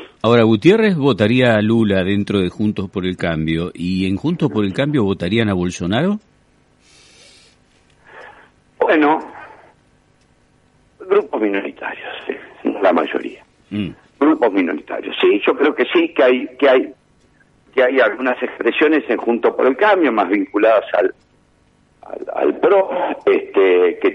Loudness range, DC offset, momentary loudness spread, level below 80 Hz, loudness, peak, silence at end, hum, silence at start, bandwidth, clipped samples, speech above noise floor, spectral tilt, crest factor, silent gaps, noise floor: 6 LU; under 0.1%; 12 LU; -52 dBFS; -16 LUFS; 0 dBFS; 0 s; none; 0 s; 11 kHz; under 0.1%; 40 dB; -7 dB/octave; 18 dB; none; -56 dBFS